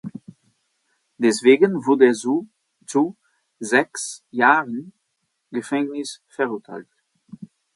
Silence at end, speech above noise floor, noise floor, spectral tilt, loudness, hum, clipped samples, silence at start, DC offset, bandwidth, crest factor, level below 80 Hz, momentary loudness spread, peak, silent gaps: 0.3 s; 54 dB; -74 dBFS; -4.5 dB/octave; -20 LUFS; none; under 0.1%; 0.05 s; under 0.1%; 11.5 kHz; 22 dB; -72 dBFS; 17 LU; 0 dBFS; none